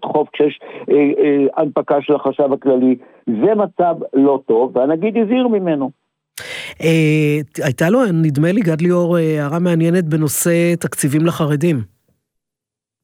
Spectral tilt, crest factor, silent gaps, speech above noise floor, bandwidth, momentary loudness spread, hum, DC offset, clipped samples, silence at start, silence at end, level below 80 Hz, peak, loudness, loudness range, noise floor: -6.5 dB/octave; 14 dB; none; 70 dB; 17 kHz; 7 LU; none; under 0.1%; under 0.1%; 0 s; 1.15 s; -62 dBFS; -2 dBFS; -16 LUFS; 2 LU; -85 dBFS